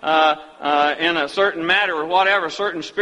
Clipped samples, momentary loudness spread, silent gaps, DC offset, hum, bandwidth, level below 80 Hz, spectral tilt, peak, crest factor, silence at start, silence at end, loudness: under 0.1%; 7 LU; none; under 0.1%; none; 11 kHz; -62 dBFS; -3.5 dB/octave; -4 dBFS; 16 dB; 0 s; 0 s; -18 LUFS